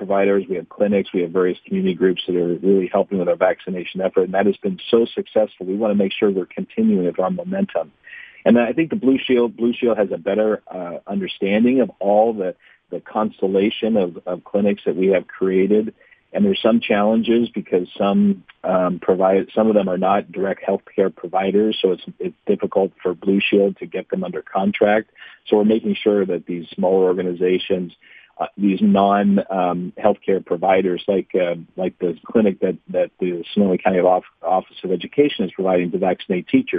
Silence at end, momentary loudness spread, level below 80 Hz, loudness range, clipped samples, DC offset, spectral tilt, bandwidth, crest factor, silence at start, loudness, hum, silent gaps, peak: 0 s; 9 LU; -60 dBFS; 2 LU; under 0.1%; under 0.1%; -9.5 dB/octave; 4.8 kHz; 18 dB; 0 s; -19 LUFS; none; none; 0 dBFS